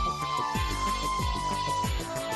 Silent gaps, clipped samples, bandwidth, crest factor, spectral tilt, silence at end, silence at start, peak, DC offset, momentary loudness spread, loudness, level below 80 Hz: none; under 0.1%; 12.5 kHz; 12 dB; -4 dB/octave; 0 s; 0 s; -18 dBFS; under 0.1%; 1 LU; -29 LUFS; -38 dBFS